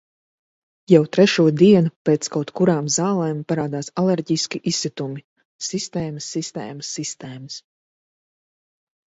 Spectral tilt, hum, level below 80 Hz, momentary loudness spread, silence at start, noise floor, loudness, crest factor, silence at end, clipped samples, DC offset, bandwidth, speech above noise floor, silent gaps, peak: -5 dB/octave; none; -62 dBFS; 16 LU; 0.9 s; under -90 dBFS; -20 LUFS; 20 dB; 1.5 s; under 0.1%; under 0.1%; 8 kHz; over 70 dB; 1.96-2.05 s, 5.24-5.36 s, 5.45-5.59 s; 0 dBFS